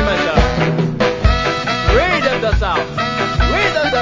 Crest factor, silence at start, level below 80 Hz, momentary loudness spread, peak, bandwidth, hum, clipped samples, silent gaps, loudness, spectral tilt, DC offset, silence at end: 14 dB; 0 s; -22 dBFS; 4 LU; 0 dBFS; 7.6 kHz; none; under 0.1%; none; -15 LUFS; -5.5 dB/octave; under 0.1%; 0 s